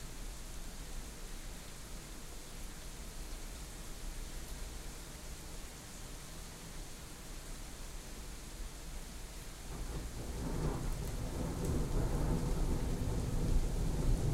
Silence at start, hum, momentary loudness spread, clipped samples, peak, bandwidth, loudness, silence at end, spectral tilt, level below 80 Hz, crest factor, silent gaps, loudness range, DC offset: 0 s; none; 12 LU; under 0.1%; -20 dBFS; 16 kHz; -43 LUFS; 0 s; -5 dB/octave; -40 dBFS; 18 dB; none; 10 LU; under 0.1%